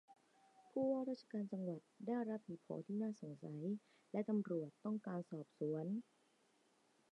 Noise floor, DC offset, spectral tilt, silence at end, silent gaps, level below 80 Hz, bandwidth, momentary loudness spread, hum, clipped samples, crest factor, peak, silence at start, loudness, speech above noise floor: -77 dBFS; under 0.1%; -9 dB/octave; 1.1 s; none; under -90 dBFS; 9.6 kHz; 9 LU; none; under 0.1%; 16 dB; -30 dBFS; 0.1 s; -45 LUFS; 33 dB